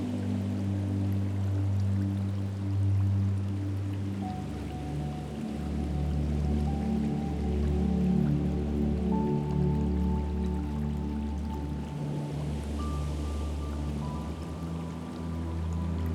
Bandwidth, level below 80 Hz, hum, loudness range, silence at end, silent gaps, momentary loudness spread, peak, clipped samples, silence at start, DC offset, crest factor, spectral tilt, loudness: 12 kHz; -36 dBFS; none; 6 LU; 0 s; none; 8 LU; -16 dBFS; under 0.1%; 0 s; under 0.1%; 14 dB; -8.5 dB/octave; -31 LUFS